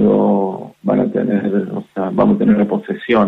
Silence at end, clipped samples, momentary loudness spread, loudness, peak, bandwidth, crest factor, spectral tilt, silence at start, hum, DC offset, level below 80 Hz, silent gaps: 0 s; under 0.1%; 10 LU; -16 LUFS; -2 dBFS; 4 kHz; 12 dB; -9.5 dB/octave; 0 s; none; under 0.1%; -50 dBFS; none